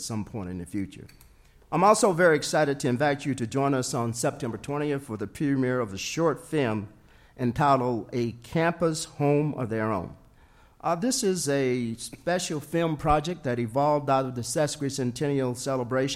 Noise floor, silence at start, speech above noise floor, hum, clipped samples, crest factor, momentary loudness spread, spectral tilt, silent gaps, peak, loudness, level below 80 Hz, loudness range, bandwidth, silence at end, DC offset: -56 dBFS; 0 s; 30 dB; none; under 0.1%; 20 dB; 11 LU; -5 dB/octave; none; -8 dBFS; -27 LUFS; -52 dBFS; 4 LU; 16 kHz; 0 s; under 0.1%